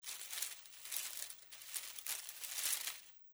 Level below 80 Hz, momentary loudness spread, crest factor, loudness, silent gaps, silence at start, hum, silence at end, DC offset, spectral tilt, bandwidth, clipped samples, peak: -88 dBFS; 11 LU; 26 dB; -42 LUFS; none; 0 s; none; 0 s; under 0.1%; 4 dB/octave; over 20 kHz; under 0.1%; -20 dBFS